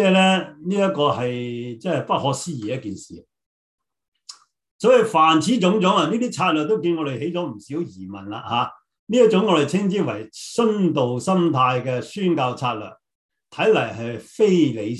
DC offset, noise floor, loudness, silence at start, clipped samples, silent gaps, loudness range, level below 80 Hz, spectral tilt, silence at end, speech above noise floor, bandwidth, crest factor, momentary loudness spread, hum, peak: under 0.1%; -46 dBFS; -20 LUFS; 0 s; under 0.1%; 3.46-3.78 s, 4.08-4.12 s, 4.71-4.79 s, 8.99-9.07 s, 13.15-13.29 s; 5 LU; -62 dBFS; -5.5 dB/octave; 0 s; 26 dB; 12 kHz; 18 dB; 14 LU; none; -4 dBFS